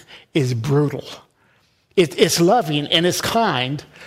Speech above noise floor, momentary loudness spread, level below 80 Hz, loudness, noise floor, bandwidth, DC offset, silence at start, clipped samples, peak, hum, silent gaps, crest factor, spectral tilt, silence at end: 41 dB; 9 LU; -54 dBFS; -18 LUFS; -59 dBFS; 16 kHz; under 0.1%; 0.1 s; under 0.1%; -2 dBFS; none; none; 18 dB; -4.5 dB/octave; 0 s